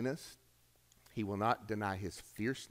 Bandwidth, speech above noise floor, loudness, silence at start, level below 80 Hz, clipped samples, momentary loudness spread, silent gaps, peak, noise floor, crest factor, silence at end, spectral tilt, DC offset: 16 kHz; 31 dB; -39 LUFS; 0 s; -68 dBFS; under 0.1%; 12 LU; none; -18 dBFS; -70 dBFS; 22 dB; 0.05 s; -5.5 dB/octave; under 0.1%